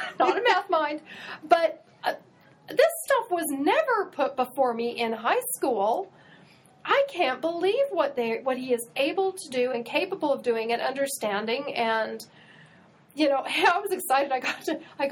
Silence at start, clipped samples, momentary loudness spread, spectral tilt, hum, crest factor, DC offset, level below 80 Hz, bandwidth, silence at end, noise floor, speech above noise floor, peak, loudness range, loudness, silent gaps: 0 s; under 0.1%; 9 LU; -2.5 dB/octave; none; 20 dB; under 0.1%; -78 dBFS; 17 kHz; 0 s; -55 dBFS; 29 dB; -6 dBFS; 2 LU; -26 LUFS; none